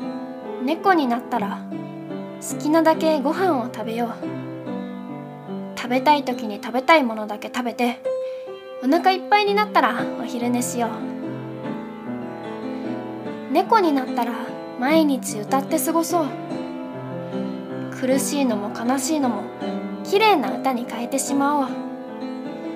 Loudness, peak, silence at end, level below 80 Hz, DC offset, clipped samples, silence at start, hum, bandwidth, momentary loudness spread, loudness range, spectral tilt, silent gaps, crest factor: -23 LUFS; -2 dBFS; 0 s; -72 dBFS; under 0.1%; under 0.1%; 0 s; none; 16 kHz; 14 LU; 3 LU; -4.5 dB/octave; none; 20 dB